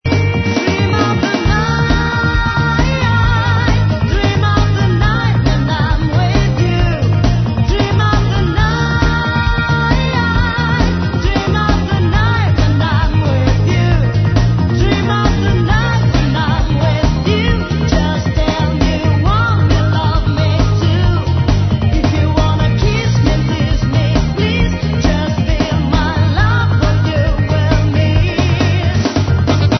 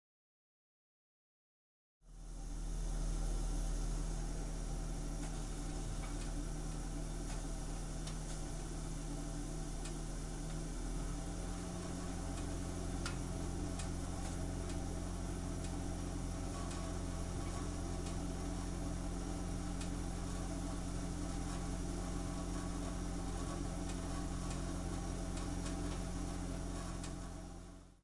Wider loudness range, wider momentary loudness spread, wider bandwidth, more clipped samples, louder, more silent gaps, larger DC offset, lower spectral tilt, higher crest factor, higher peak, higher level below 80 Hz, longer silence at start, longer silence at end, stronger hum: about the same, 1 LU vs 2 LU; about the same, 2 LU vs 3 LU; second, 6.4 kHz vs 11.5 kHz; neither; first, -14 LUFS vs -44 LUFS; neither; neither; first, -6.5 dB/octave vs -5 dB/octave; about the same, 12 dB vs 14 dB; first, 0 dBFS vs -26 dBFS; first, -20 dBFS vs -44 dBFS; second, 0.05 s vs 2.05 s; about the same, 0 s vs 0.05 s; neither